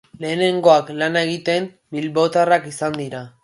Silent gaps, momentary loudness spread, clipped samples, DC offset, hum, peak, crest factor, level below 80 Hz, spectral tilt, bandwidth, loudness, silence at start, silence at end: none; 13 LU; under 0.1%; under 0.1%; none; 0 dBFS; 18 dB; -64 dBFS; -5 dB/octave; 11.5 kHz; -19 LUFS; 0.2 s; 0.15 s